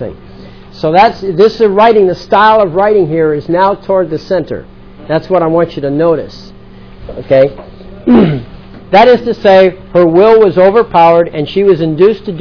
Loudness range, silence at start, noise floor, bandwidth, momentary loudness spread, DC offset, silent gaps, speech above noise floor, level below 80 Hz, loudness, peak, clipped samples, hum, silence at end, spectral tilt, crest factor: 6 LU; 0 s; -33 dBFS; 5.4 kHz; 10 LU; 0.8%; none; 24 dB; -38 dBFS; -9 LUFS; 0 dBFS; 2%; none; 0 s; -8 dB/octave; 10 dB